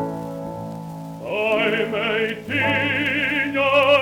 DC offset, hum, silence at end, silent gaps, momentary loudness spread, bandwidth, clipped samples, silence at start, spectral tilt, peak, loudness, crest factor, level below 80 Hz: under 0.1%; none; 0 s; none; 15 LU; 18 kHz; under 0.1%; 0 s; -5.5 dB/octave; -4 dBFS; -20 LUFS; 18 dB; -56 dBFS